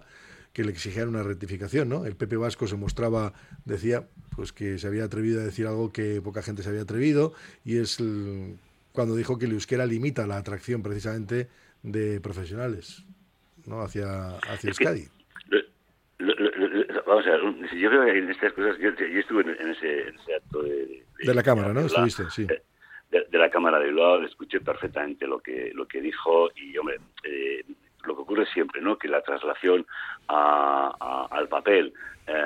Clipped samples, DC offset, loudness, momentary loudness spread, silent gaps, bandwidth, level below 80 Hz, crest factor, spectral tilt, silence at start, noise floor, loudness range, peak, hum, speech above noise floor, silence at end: under 0.1%; under 0.1%; -26 LUFS; 13 LU; none; 15 kHz; -54 dBFS; 20 dB; -6 dB/octave; 0.3 s; -65 dBFS; 7 LU; -6 dBFS; none; 39 dB; 0 s